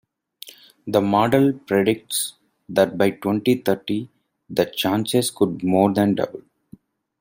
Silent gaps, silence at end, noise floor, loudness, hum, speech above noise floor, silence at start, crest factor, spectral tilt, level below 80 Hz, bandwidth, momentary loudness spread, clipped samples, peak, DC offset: none; 0.8 s; -50 dBFS; -21 LUFS; none; 30 dB; 0.45 s; 18 dB; -5 dB/octave; -60 dBFS; 16.5 kHz; 20 LU; under 0.1%; -2 dBFS; under 0.1%